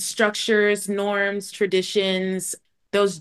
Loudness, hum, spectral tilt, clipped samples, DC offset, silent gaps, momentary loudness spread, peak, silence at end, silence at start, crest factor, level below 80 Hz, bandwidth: -22 LUFS; none; -3.5 dB/octave; under 0.1%; under 0.1%; none; 7 LU; -4 dBFS; 0 s; 0 s; 18 dB; -72 dBFS; 12.5 kHz